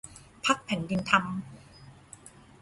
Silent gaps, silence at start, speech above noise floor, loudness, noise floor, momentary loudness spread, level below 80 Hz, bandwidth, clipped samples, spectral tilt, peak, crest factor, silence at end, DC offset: none; 0.05 s; 24 dB; -28 LUFS; -52 dBFS; 24 LU; -60 dBFS; 11.5 kHz; under 0.1%; -4 dB/octave; -6 dBFS; 26 dB; 0.35 s; under 0.1%